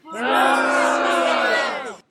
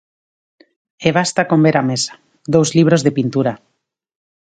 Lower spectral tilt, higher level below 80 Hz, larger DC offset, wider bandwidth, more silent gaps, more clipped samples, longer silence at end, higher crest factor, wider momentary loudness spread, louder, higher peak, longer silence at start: second, -1.5 dB/octave vs -5.5 dB/octave; second, -74 dBFS vs -56 dBFS; neither; first, 16 kHz vs 9.4 kHz; neither; neither; second, 0.15 s vs 0.85 s; about the same, 14 dB vs 16 dB; second, 6 LU vs 9 LU; second, -18 LUFS vs -15 LUFS; second, -4 dBFS vs 0 dBFS; second, 0.05 s vs 1 s